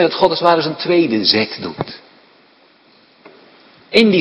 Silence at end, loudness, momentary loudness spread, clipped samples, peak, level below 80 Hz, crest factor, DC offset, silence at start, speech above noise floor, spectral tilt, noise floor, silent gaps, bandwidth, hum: 0 s; -15 LUFS; 15 LU; under 0.1%; 0 dBFS; -56 dBFS; 18 dB; under 0.1%; 0 s; 36 dB; -6 dB/octave; -51 dBFS; none; 11 kHz; none